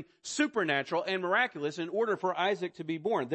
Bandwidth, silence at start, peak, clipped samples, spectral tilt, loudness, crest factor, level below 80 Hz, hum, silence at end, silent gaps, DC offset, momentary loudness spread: 8.6 kHz; 0 s; -14 dBFS; under 0.1%; -4 dB/octave; -31 LUFS; 18 dB; -78 dBFS; none; 0 s; none; under 0.1%; 7 LU